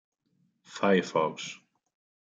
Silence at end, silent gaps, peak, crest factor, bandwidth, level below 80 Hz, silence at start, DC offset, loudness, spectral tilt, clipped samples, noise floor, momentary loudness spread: 0.7 s; none; -10 dBFS; 22 dB; 7.8 kHz; -80 dBFS; 0.7 s; under 0.1%; -28 LUFS; -5 dB/octave; under 0.1%; -73 dBFS; 20 LU